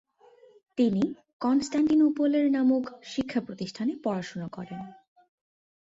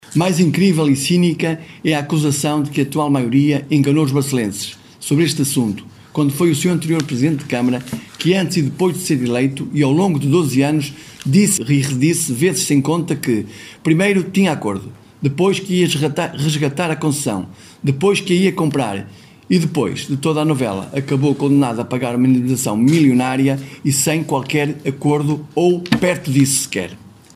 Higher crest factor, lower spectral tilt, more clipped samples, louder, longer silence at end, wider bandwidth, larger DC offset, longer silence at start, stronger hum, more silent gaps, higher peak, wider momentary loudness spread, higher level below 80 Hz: about the same, 14 dB vs 16 dB; about the same, -6.5 dB/octave vs -5.5 dB/octave; neither; second, -27 LUFS vs -17 LUFS; first, 1.05 s vs 0.25 s; second, 7.8 kHz vs 16 kHz; neither; first, 0.75 s vs 0.1 s; neither; first, 1.33-1.40 s vs none; second, -14 dBFS vs 0 dBFS; first, 15 LU vs 8 LU; second, -66 dBFS vs -56 dBFS